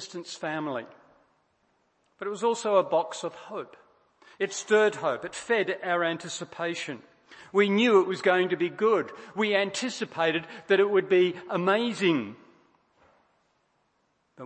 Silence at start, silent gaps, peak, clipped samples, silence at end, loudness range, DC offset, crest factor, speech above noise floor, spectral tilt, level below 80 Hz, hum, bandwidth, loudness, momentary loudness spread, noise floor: 0 s; none; -8 dBFS; under 0.1%; 0 s; 5 LU; under 0.1%; 20 dB; 46 dB; -4.5 dB/octave; -78 dBFS; none; 8.8 kHz; -26 LUFS; 14 LU; -72 dBFS